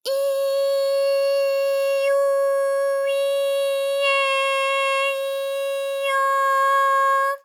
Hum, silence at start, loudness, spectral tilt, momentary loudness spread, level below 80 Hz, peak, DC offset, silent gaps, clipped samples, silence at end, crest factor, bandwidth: none; 0.05 s; -20 LUFS; 4.5 dB/octave; 5 LU; under -90 dBFS; -10 dBFS; under 0.1%; none; under 0.1%; 0.05 s; 10 dB; 17 kHz